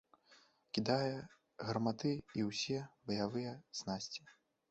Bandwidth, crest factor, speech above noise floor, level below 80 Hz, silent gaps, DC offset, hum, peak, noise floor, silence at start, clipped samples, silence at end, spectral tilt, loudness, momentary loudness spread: 8.2 kHz; 20 dB; 29 dB; -72 dBFS; none; under 0.1%; none; -20 dBFS; -68 dBFS; 0.3 s; under 0.1%; 0.4 s; -5 dB/octave; -40 LUFS; 10 LU